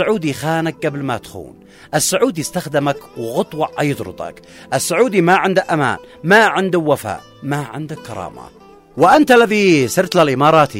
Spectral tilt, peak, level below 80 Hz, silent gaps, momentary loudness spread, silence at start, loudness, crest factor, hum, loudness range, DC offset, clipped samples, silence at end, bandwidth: -4.5 dB/octave; 0 dBFS; -52 dBFS; none; 17 LU; 0 s; -15 LUFS; 16 dB; none; 5 LU; under 0.1%; under 0.1%; 0 s; 16 kHz